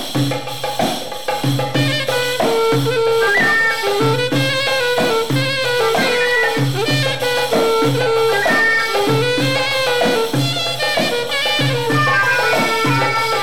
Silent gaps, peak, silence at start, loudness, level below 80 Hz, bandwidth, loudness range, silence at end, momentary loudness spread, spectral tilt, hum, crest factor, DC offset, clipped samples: none; -4 dBFS; 0 s; -16 LUFS; -50 dBFS; 17.5 kHz; 1 LU; 0 s; 5 LU; -4 dB/octave; none; 12 dB; 3%; under 0.1%